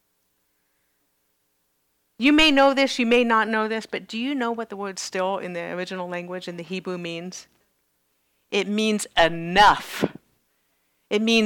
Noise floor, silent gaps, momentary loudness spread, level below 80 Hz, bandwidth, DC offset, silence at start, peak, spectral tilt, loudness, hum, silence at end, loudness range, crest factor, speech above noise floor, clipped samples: -71 dBFS; none; 15 LU; -52 dBFS; 19 kHz; under 0.1%; 2.2 s; -6 dBFS; -4 dB/octave; -22 LUFS; none; 0 s; 10 LU; 18 dB; 49 dB; under 0.1%